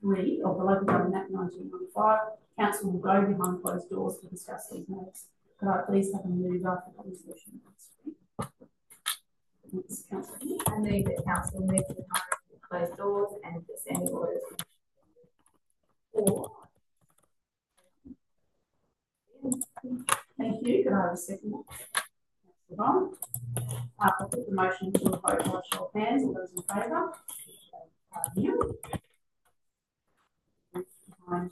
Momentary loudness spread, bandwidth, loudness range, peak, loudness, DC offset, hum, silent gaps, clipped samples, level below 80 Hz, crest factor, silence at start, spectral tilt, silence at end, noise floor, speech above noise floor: 15 LU; 13 kHz; 8 LU; -4 dBFS; -31 LUFS; under 0.1%; none; none; under 0.1%; -60 dBFS; 28 dB; 0 s; -5 dB/octave; 0 s; -81 dBFS; 51 dB